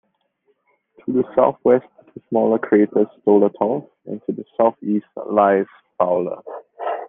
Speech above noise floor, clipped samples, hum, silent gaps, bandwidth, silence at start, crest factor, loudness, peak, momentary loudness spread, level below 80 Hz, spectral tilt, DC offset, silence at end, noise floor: 48 dB; under 0.1%; none; none; 3.6 kHz; 1.05 s; 18 dB; -19 LUFS; -2 dBFS; 13 LU; -66 dBFS; -11 dB/octave; under 0.1%; 0 s; -66 dBFS